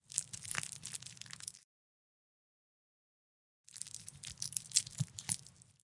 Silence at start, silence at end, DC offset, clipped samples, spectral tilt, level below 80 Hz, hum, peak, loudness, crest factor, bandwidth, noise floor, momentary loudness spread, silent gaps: 0.1 s; 0.1 s; under 0.1%; under 0.1%; -1 dB/octave; -74 dBFS; none; -10 dBFS; -40 LUFS; 36 dB; 11.5 kHz; under -90 dBFS; 15 LU; 1.64-3.64 s